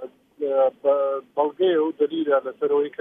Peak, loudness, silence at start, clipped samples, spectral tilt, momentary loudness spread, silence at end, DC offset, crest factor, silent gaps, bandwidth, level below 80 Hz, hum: -8 dBFS; -23 LUFS; 0 s; under 0.1%; -7.5 dB/octave; 5 LU; 0.1 s; under 0.1%; 14 dB; none; 3.8 kHz; -80 dBFS; none